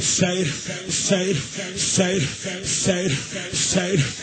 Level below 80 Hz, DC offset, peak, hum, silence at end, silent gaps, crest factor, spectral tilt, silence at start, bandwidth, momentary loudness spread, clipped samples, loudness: -50 dBFS; under 0.1%; -6 dBFS; none; 0 s; none; 16 dB; -3.5 dB/octave; 0 s; 9.2 kHz; 6 LU; under 0.1%; -22 LUFS